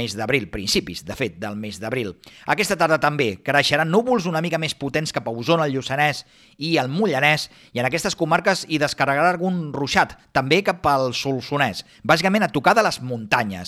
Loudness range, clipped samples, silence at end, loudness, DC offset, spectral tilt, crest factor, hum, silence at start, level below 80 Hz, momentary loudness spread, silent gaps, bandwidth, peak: 2 LU; under 0.1%; 0 s; -21 LUFS; under 0.1%; -4.5 dB/octave; 18 dB; none; 0 s; -52 dBFS; 9 LU; none; 16 kHz; -4 dBFS